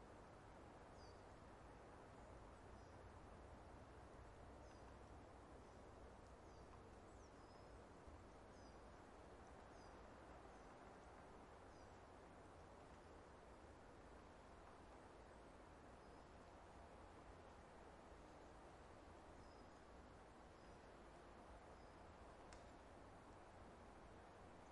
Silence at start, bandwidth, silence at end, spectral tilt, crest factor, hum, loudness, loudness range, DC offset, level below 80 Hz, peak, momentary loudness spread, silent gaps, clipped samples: 0 s; 11 kHz; 0 s; -5.5 dB/octave; 18 dB; none; -64 LUFS; 1 LU; under 0.1%; -70 dBFS; -44 dBFS; 1 LU; none; under 0.1%